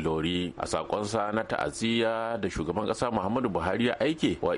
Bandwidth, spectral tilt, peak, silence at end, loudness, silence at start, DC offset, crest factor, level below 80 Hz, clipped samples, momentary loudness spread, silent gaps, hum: 11.5 kHz; -5 dB/octave; -14 dBFS; 0 s; -29 LUFS; 0 s; under 0.1%; 14 dB; -50 dBFS; under 0.1%; 4 LU; none; none